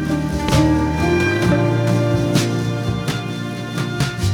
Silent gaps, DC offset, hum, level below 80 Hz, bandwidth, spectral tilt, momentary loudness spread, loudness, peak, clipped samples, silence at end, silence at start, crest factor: none; under 0.1%; none; -32 dBFS; 18 kHz; -6 dB/octave; 8 LU; -18 LUFS; -2 dBFS; under 0.1%; 0 s; 0 s; 14 dB